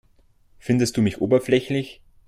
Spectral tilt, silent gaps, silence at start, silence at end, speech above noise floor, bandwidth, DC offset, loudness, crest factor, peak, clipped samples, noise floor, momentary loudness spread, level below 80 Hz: -6 dB/octave; none; 0.65 s; 0.35 s; 36 dB; 14.5 kHz; under 0.1%; -22 LUFS; 16 dB; -6 dBFS; under 0.1%; -57 dBFS; 13 LU; -54 dBFS